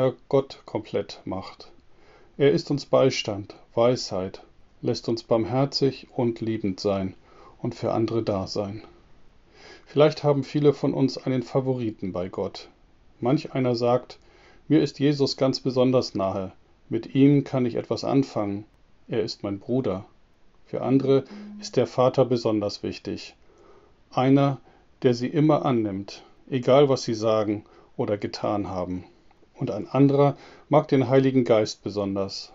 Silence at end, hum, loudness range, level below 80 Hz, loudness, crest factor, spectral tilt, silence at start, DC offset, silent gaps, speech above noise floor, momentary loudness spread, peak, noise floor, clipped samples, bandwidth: 0.1 s; none; 4 LU; -60 dBFS; -24 LUFS; 22 dB; -6.5 dB/octave; 0 s; under 0.1%; none; 31 dB; 14 LU; -4 dBFS; -55 dBFS; under 0.1%; 7.8 kHz